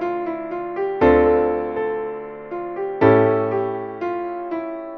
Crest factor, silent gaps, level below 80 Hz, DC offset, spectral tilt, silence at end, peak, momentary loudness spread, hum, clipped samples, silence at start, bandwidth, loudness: 18 dB; none; -42 dBFS; under 0.1%; -9.5 dB/octave; 0 s; -2 dBFS; 14 LU; none; under 0.1%; 0 s; 5 kHz; -20 LUFS